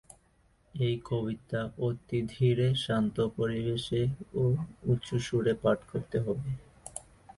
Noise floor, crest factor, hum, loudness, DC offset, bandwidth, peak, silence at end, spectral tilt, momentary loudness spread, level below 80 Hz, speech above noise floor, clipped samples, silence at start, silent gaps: -66 dBFS; 16 dB; none; -31 LUFS; under 0.1%; 11.5 kHz; -14 dBFS; 0.05 s; -7 dB/octave; 9 LU; -56 dBFS; 36 dB; under 0.1%; 0.75 s; none